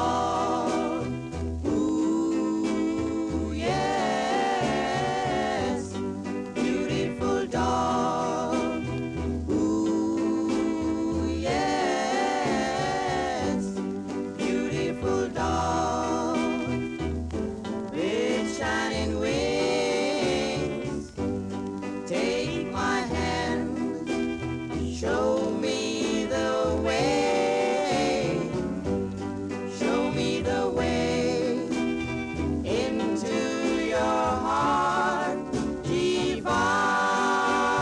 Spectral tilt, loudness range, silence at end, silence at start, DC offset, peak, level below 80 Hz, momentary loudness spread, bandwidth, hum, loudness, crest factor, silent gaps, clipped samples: -5 dB/octave; 3 LU; 0 s; 0 s; under 0.1%; -14 dBFS; -46 dBFS; 7 LU; 11.5 kHz; none; -27 LUFS; 14 dB; none; under 0.1%